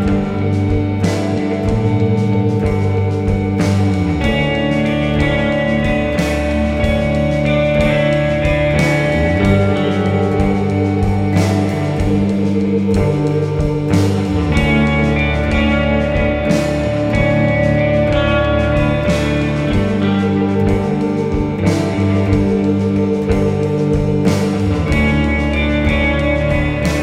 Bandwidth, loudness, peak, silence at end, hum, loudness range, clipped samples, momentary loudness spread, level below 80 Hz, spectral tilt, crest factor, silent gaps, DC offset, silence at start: 13 kHz; -15 LUFS; 0 dBFS; 0 s; none; 1 LU; under 0.1%; 3 LU; -26 dBFS; -7 dB/octave; 14 dB; none; under 0.1%; 0 s